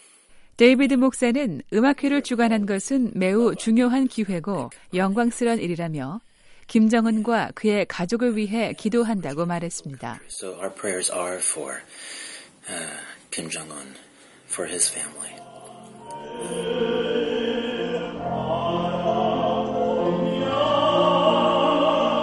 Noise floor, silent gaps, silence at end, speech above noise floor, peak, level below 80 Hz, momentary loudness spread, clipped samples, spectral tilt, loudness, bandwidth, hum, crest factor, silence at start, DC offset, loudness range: -50 dBFS; none; 0 s; 27 dB; -4 dBFS; -56 dBFS; 16 LU; under 0.1%; -4.5 dB/octave; -23 LUFS; 11.5 kHz; none; 20 dB; 0.35 s; under 0.1%; 8 LU